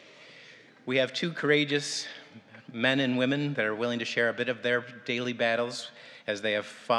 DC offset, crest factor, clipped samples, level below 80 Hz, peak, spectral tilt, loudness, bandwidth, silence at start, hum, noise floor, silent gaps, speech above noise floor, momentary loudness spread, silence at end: under 0.1%; 20 dB; under 0.1%; -90 dBFS; -10 dBFS; -4.5 dB/octave; -28 LUFS; 12 kHz; 0.1 s; none; -53 dBFS; none; 24 dB; 15 LU; 0 s